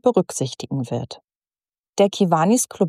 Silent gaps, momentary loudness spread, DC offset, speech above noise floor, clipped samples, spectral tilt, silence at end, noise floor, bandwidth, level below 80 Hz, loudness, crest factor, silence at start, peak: 1.24-1.28 s, 1.35-1.39 s, 1.78-1.93 s; 15 LU; under 0.1%; over 70 dB; under 0.1%; -5.5 dB/octave; 0 s; under -90 dBFS; 15 kHz; -66 dBFS; -21 LUFS; 18 dB; 0.05 s; -4 dBFS